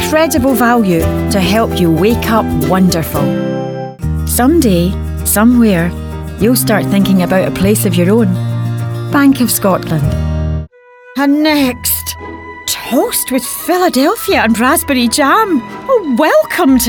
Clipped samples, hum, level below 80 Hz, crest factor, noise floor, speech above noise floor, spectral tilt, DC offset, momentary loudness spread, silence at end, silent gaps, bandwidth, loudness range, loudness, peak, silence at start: under 0.1%; none; -30 dBFS; 12 dB; -39 dBFS; 28 dB; -5 dB/octave; under 0.1%; 9 LU; 0 s; none; over 20 kHz; 3 LU; -12 LUFS; 0 dBFS; 0 s